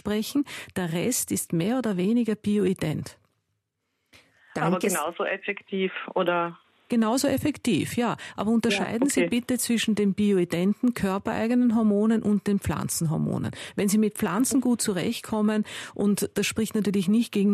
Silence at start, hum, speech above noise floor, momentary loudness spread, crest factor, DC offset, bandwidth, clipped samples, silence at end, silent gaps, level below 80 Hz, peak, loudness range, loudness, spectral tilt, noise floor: 0.05 s; none; 53 dB; 6 LU; 14 dB; under 0.1%; 14 kHz; under 0.1%; 0 s; none; -56 dBFS; -12 dBFS; 5 LU; -25 LUFS; -5 dB/octave; -78 dBFS